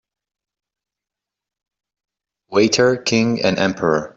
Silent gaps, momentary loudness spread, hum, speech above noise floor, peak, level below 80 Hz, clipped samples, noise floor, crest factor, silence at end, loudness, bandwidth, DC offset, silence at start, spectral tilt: none; 4 LU; none; 70 dB; -2 dBFS; -56 dBFS; under 0.1%; -86 dBFS; 18 dB; 0.05 s; -17 LUFS; 8 kHz; under 0.1%; 2.5 s; -4.5 dB/octave